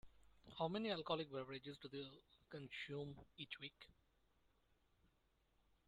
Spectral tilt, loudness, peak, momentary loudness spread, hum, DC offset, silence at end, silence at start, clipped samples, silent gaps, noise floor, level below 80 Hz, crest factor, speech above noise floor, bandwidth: -6.5 dB/octave; -49 LUFS; -26 dBFS; 16 LU; none; under 0.1%; 1.95 s; 0.05 s; under 0.1%; none; -81 dBFS; -78 dBFS; 24 dB; 32 dB; 12.5 kHz